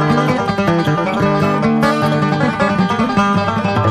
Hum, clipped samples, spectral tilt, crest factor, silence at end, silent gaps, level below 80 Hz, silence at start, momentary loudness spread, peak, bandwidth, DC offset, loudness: none; under 0.1%; -7 dB/octave; 12 dB; 0 s; none; -42 dBFS; 0 s; 2 LU; -2 dBFS; 13.5 kHz; under 0.1%; -15 LUFS